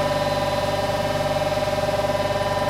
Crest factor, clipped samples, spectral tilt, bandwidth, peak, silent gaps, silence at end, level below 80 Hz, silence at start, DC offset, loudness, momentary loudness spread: 12 dB; under 0.1%; -5 dB/octave; 16 kHz; -10 dBFS; none; 0 s; -40 dBFS; 0 s; under 0.1%; -23 LUFS; 1 LU